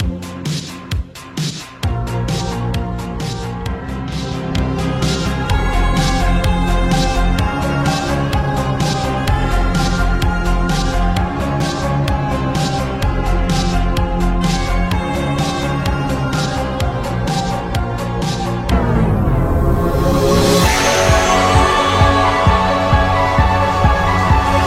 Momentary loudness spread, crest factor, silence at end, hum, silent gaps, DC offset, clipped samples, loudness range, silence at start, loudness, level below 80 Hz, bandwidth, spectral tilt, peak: 11 LU; 14 dB; 0 s; none; none; under 0.1%; under 0.1%; 8 LU; 0 s; -16 LUFS; -22 dBFS; 16 kHz; -5.5 dB/octave; 0 dBFS